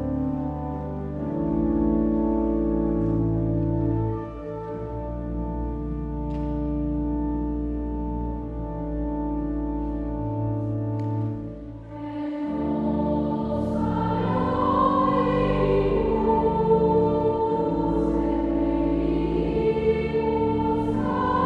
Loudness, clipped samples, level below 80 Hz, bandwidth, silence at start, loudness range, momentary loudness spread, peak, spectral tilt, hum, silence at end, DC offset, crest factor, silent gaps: -25 LUFS; under 0.1%; -34 dBFS; 5.2 kHz; 0 s; 7 LU; 10 LU; -8 dBFS; -10 dB/octave; none; 0 s; under 0.1%; 16 dB; none